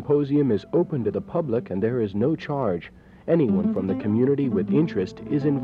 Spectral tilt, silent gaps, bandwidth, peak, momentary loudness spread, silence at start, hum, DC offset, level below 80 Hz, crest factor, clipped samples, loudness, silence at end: -10 dB/octave; none; 7 kHz; -8 dBFS; 6 LU; 0 s; none; under 0.1%; -58 dBFS; 14 dB; under 0.1%; -24 LUFS; 0 s